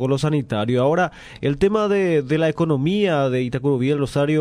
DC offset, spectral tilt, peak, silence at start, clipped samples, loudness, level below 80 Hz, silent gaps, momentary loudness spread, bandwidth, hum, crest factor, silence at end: under 0.1%; -7 dB/octave; -6 dBFS; 0 s; under 0.1%; -20 LUFS; -46 dBFS; none; 3 LU; 12.5 kHz; none; 14 dB; 0 s